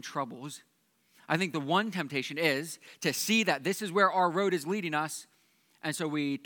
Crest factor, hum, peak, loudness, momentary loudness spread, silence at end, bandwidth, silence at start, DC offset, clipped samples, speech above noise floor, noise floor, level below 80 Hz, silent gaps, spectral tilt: 22 dB; none; -10 dBFS; -30 LUFS; 13 LU; 0.05 s; 19 kHz; 0.05 s; under 0.1%; under 0.1%; 37 dB; -68 dBFS; -90 dBFS; none; -4 dB/octave